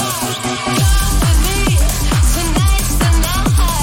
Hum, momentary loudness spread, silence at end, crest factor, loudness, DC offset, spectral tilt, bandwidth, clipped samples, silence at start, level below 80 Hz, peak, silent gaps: none; 3 LU; 0 s; 10 dB; -15 LUFS; under 0.1%; -4 dB/octave; 17 kHz; under 0.1%; 0 s; -16 dBFS; -4 dBFS; none